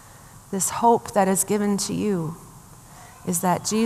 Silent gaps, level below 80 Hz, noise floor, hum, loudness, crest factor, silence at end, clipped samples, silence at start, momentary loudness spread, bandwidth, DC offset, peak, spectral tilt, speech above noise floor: none; -56 dBFS; -46 dBFS; none; -22 LUFS; 18 dB; 0 s; under 0.1%; 0.05 s; 13 LU; 15 kHz; under 0.1%; -6 dBFS; -4.5 dB/octave; 24 dB